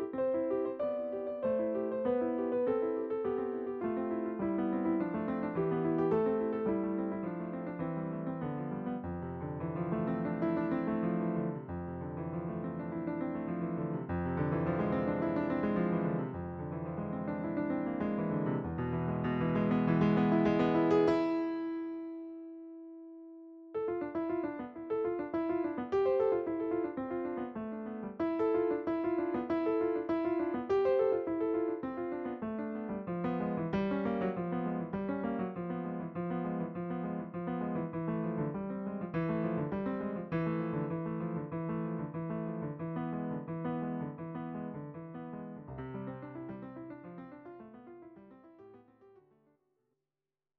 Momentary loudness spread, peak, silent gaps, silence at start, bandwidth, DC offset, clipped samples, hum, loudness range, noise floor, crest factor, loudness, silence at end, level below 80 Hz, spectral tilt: 12 LU; -16 dBFS; none; 0 s; 6 kHz; under 0.1%; under 0.1%; none; 9 LU; under -90 dBFS; 18 dB; -35 LUFS; 1.5 s; -62 dBFS; -8 dB/octave